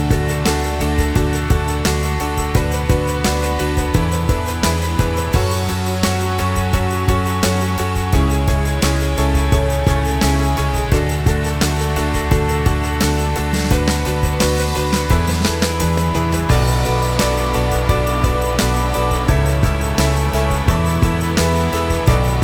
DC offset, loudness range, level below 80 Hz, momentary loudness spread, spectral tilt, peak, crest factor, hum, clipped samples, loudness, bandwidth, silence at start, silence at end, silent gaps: under 0.1%; 1 LU; -22 dBFS; 2 LU; -5 dB/octave; 0 dBFS; 16 dB; none; under 0.1%; -17 LUFS; over 20 kHz; 0 s; 0 s; none